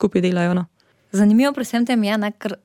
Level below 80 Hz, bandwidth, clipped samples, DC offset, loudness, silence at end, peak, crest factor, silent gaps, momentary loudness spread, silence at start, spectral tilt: -60 dBFS; 15.5 kHz; under 0.1%; under 0.1%; -19 LUFS; 0.1 s; -4 dBFS; 14 dB; none; 10 LU; 0 s; -6.5 dB/octave